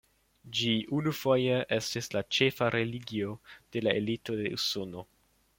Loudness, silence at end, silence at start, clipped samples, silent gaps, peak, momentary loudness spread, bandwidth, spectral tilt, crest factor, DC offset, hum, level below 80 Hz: -30 LUFS; 0.55 s; 0.45 s; under 0.1%; none; -10 dBFS; 10 LU; 16.5 kHz; -4.5 dB/octave; 22 dB; under 0.1%; none; -66 dBFS